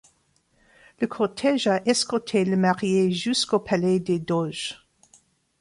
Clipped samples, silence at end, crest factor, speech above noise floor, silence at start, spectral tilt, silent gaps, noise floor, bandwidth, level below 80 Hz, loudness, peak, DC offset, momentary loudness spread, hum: under 0.1%; 0.85 s; 18 dB; 43 dB; 1 s; -5 dB/octave; none; -66 dBFS; 11.5 kHz; -62 dBFS; -23 LUFS; -8 dBFS; under 0.1%; 8 LU; none